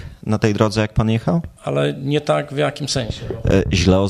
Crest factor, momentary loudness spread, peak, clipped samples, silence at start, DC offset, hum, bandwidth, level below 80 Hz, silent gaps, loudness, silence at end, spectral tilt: 18 dB; 6 LU; 0 dBFS; under 0.1%; 0 s; under 0.1%; none; 12.5 kHz; -34 dBFS; none; -19 LUFS; 0 s; -6 dB/octave